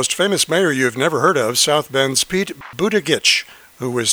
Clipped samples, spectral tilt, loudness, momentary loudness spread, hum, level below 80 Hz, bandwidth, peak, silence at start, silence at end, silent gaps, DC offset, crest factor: under 0.1%; -2.5 dB/octave; -16 LUFS; 8 LU; none; -56 dBFS; over 20 kHz; 0 dBFS; 0 s; 0 s; none; under 0.1%; 18 dB